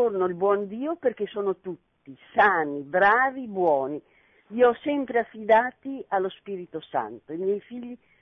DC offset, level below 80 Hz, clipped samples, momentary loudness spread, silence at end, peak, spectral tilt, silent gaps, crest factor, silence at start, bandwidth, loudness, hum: under 0.1%; -68 dBFS; under 0.1%; 16 LU; 0.25 s; -8 dBFS; -8 dB/octave; none; 16 dB; 0 s; 6 kHz; -25 LUFS; none